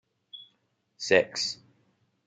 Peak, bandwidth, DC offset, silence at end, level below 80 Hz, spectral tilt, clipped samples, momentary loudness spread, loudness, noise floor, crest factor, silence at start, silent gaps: -8 dBFS; 9.4 kHz; under 0.1%; 0.7 s; -76 dBFS; -2.5 dB/octave; under 0.1%; 23 LU; -26 LUFS; -74 dBFS; 24 dB; 0.35 s; none